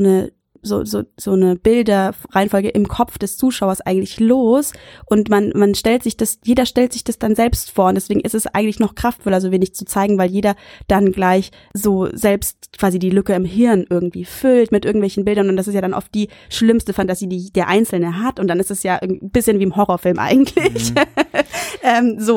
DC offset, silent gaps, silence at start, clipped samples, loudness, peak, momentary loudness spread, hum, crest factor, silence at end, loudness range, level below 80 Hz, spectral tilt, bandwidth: under 0.1%; none; 0 s; under 0.1%; -17 LUFS; 0 dBFS; 6 LU; none; 16 dB; 0 s; 2 LU; -40 dBFS; -5.5 dB/octave; 18 kHz